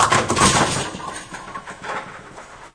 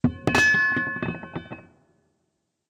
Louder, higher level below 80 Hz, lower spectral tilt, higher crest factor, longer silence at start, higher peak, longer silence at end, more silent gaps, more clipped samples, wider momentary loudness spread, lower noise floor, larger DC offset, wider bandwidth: about the same, -19 LUFS vs -21 LUFS; first, -42 dBFS vs -54 dBFS; second, -3 dB/octave vs -4.5 dB/octave; about the same, 20 dB vs 20 dB; about the same, 0 s vs 0.05 s; first, -2 dBFS vs -6 dBFS; second, 0.05 s vs 1.1 s; neither; neither; about the same, 22 LU vs 22 LU; second, -40 dBFS vs -76 dBFS; neither; second, 11 kHz vs 16 kHz